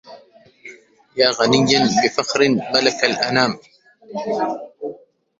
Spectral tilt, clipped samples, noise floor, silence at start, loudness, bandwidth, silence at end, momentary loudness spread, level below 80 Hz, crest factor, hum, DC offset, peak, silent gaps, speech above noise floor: -3.5 dB/octave; under 0.1%; -48 dBFS; 0.05 s; -17 LUFS; 8 kHz; 0.45 s; 17 LU; -58 dBFS; 20 dB; none; under 0.1%; 0 dBFS; none; 31 dB